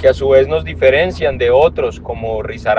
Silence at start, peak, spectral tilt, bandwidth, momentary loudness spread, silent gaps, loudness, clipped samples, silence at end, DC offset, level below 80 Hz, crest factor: 0 s; 0 dBFS; -6.5 dB/octave; 7.6 kHz; 10 LU; none; -14 LUFS; under 0.1%; 0 s; under 0.1%; -34 dBFS; 12 dB